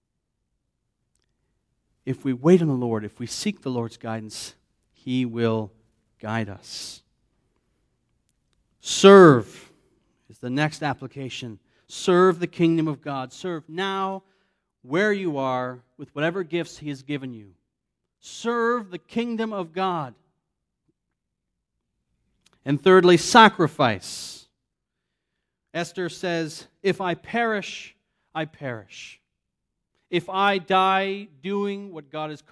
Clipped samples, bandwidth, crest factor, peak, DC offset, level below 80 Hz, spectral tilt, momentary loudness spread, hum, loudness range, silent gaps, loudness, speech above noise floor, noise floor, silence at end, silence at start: under 0.1%; 11 kHz; 24 dB; 0 dBFS; under 0.1%; -66 dBFS; -5.5 dB/octave; 21 LU; none; 12 LU; none; -22 LUFS; 59 dB; -81 dBFS; 0.15 s; 2.05 s